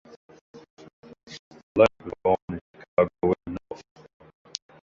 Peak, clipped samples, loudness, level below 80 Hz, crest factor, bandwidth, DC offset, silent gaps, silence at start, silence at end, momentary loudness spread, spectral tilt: -4 dBFS; under 0.1%; -26 LUFS; -54 dBFS; 24 dB; 7.6 kHz; under 0.1%; 0.70-0.77 s, 0.93-1.03 s, 1.39-1.51 s, 1.63-1.75 s, 2.42-2.48 s, 2.61-2.74 s, 2.88-2.97 s; 0.55 s; 1.1 s; 23 LU; -6 dB/octave